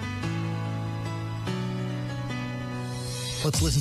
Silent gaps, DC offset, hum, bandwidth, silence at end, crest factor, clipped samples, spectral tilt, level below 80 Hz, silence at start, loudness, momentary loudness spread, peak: none; under 0.1%; none; 15 kHz; 0 s; 16 dB; under 0.1%; -5 dB/octave; -42 dBFS; 0 s; -30 LUFS; 7 LU; -14 dBFS